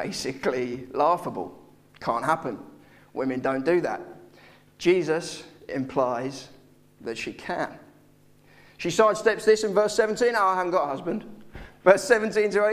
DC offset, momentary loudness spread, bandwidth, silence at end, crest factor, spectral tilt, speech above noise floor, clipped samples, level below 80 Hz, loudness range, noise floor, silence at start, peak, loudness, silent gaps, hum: under 0.1%; 16 LU; 15 kHz; 0 s; 24 dB; -4.5 dB/octave; 32 dB; under 0.1%; -58 dBFS; 8 LU; -56 dBFS; 0 s; -2 dBFS; -25 LUFS; none; none